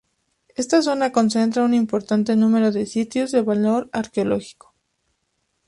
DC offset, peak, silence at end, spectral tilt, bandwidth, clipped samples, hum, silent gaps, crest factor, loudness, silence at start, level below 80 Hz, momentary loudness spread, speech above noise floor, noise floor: under 0.1%; -4 dBFS; 1.15 s; -5.5 dB/octave; 11.5 kHz; under 0.1%; none; none; 16 dB; -20 LUFS; 0.6 s; -60 dBFS; 6 LU; 53 dB; -72 dBFS